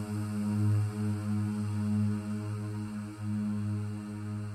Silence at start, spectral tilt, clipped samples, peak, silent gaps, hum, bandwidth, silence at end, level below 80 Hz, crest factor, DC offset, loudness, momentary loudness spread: 0 s; -8 dB/octave; under 0.1%; -20 dBFS; none; none; 12.5 kHz; 0 s; -64 dBFS; 12 dB; under 0.1%; -33 LUFS; 8 LU